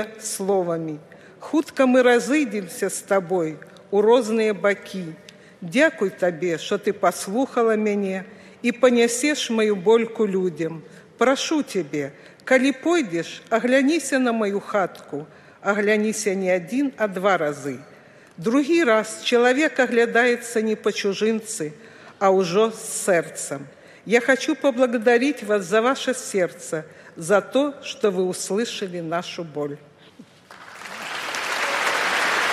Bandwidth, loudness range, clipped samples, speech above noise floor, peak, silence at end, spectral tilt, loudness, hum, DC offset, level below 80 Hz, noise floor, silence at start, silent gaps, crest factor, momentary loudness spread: 15 kHz; 4 LU; under 0.1%; 27 dB; -4 dBFS; 0 s; -4 dB/octave; -22 LUFS; none; under 0.1%; -74 dBFS; -48 dBFS; 0 s; none; 18 dB; 13 LU